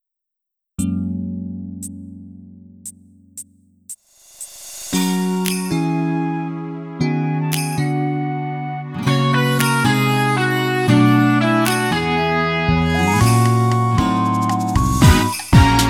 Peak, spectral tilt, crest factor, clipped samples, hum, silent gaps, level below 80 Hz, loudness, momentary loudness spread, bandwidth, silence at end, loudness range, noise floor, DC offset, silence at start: 0 dBFS; -5.5 dB/octave; 18 dB; under 0.1%; none; none; -32 dBFS; -17 LUFS; 22 LU; 18 kHz; 0 s; 13 LU; -81 dBFS; under 0.1%; 0.8 s